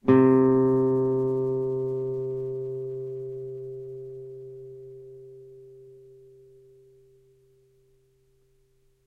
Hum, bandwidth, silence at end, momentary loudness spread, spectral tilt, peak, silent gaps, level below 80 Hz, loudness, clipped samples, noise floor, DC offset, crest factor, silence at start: none; 3.6 kHz; 3.15 s; 26 LU; -11 dB/octave; -6 dBFS; none; -64 dBFS; -25 LUFS; under 0.1%; -65 dBFS; under 0.1%; 22 dB; 0.05 s